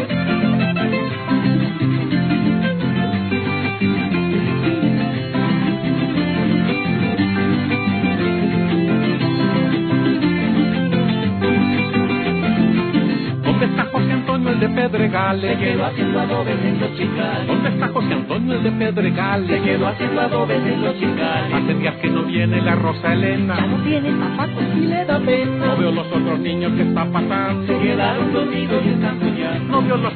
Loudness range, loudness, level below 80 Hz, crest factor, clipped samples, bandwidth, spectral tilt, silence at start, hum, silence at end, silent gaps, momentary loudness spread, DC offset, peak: 1 LU; -18 LUFS; -48 dBFS; 12 dB; under 0.1%; 4.5 kHz; -10.5 dB/octave; 0 s; none; 0 s; none; 3 LU; under 0.1%; -4 dBFS